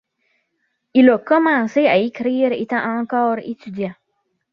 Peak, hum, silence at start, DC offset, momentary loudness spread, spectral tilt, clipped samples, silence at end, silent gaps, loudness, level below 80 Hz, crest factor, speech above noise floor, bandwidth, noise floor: -2 dBFS; none; 0.95 s; under 0.1%; 14 LU; -7 dB/octave; under 0.1%; 0.6 s; none; -18 LUFS; -64 dBFS; 16 dB; 54 dB; 6.4 kHz; -71 dBFS